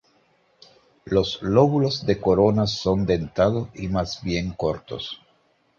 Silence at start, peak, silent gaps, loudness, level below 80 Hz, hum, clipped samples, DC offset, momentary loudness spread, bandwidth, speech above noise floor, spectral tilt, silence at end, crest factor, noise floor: 1.05 s; -4 dBFS; none; -22 LUFS; -44 dBFS; none; under 0.1%; under 0.1%; 11 LU; 7.4 kHz; 42 dB; -6.5 dB/octave; 0.65 s; 20 dB; -63 dBFS